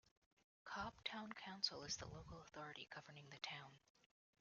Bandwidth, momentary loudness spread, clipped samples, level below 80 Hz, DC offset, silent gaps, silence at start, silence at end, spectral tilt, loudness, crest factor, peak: 7.2 kHz; 13 LU; under 0.1%; -74 dBFS; under 0.1%; none; 0.65 s; 0.6 s; -1.5 dB/octave; -51 LUFS; 26 dB; -28 dBFS